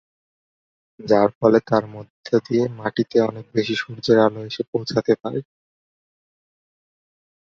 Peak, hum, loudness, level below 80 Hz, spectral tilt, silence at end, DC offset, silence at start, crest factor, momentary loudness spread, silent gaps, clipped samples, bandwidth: -2 dBFS; none; -20 LUFS; -60 dBFS; -6.5 dB/octave; 2 s; under 0.1%; 1 s; 20 dB; 12 LU; 1.35-1.41 s, 2.10-2.23 s, 4.68-4.73 s; under 0.1%; 7.4 kHz